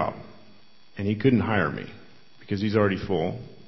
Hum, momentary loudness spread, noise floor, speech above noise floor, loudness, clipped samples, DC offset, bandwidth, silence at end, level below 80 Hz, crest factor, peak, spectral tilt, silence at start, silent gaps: none; 18 LU; -57 dBFS; 32 dB; -25 LUFS; under 0.1%; 0.4%; 6 kHz; 0.15 s; -50 dBFS; 20 dB; -8 dBFS; -8.5 dB/octave; 0 s; none